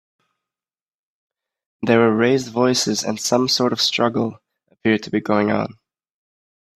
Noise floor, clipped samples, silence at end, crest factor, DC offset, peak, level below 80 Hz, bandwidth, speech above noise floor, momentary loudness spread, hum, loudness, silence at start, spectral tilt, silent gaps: under -90 dBFS; under 0.1%; 1.05 s; 20 dB; under 0.1%; 0 dBFS; -62 dBFS; 14.5 kHz; over 72 dB; 9 LU; none; -19 LUFS; 1.8 s; -4 dB/octave; none